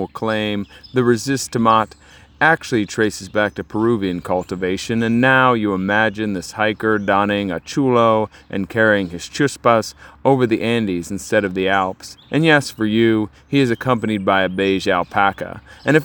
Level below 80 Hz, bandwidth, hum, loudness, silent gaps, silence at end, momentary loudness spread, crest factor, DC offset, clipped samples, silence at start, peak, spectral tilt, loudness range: -52 dBFS; over 20 kHz; none; -18 LUFS; none; 0 s; 8 LU; 18 dB; under 0.1%; under 0.1%; 0 s; 0 dBFS; -5.5 dB/octave; 2 LU